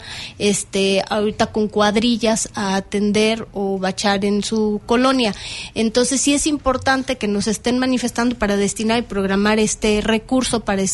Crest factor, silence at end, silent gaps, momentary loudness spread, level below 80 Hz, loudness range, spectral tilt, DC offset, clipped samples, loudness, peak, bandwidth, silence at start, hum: 14 dB; 0 s; none; 5 LU; -40 dBFS; 1 LU; -3.5 dB/octave; under 0.1%; under 0.1%; -18 LUFS; -4 dBFS; 11.5 kHz; 0 s; none